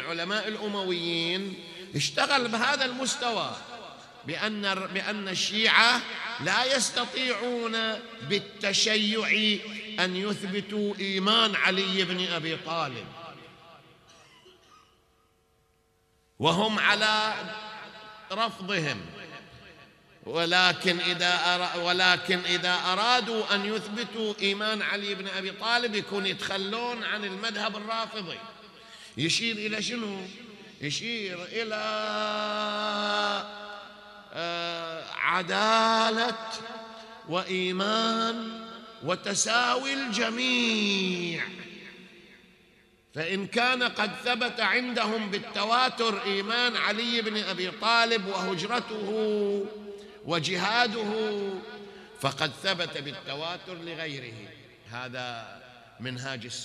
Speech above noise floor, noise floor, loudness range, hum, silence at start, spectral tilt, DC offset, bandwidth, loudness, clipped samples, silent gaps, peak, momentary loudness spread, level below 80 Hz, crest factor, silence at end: 40 dB; -68 dBFS; 7 LU; none; 0 s; -3 dB/octave; under 0.1%; 13.5 kHz; -27 LUFS; under 0.1%; none; -4 dBFS; 18 LU; -72 dBFS; 26 dB; 0 s